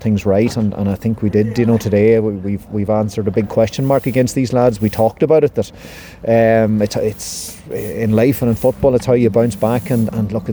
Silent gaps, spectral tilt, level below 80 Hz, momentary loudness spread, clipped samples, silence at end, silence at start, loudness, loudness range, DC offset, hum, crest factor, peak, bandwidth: none; -7 dB/octave; -40 dBFS; 10 LU; under 0.1%; 0 s; 0 s; -15 LUFS; 1 LU; under 0.1%; none; 14 dB; -2 dBFS; over 20 kHz